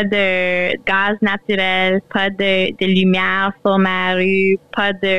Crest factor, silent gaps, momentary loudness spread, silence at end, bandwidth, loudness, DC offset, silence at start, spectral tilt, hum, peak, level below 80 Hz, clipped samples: 10 dB; none; 3 LU; 0 s; 7.8 kHz; -16 LUFS; 2%; 0 s; -7 dB/octave; none; -6 dBFS; -52 dBFS; under 0.1%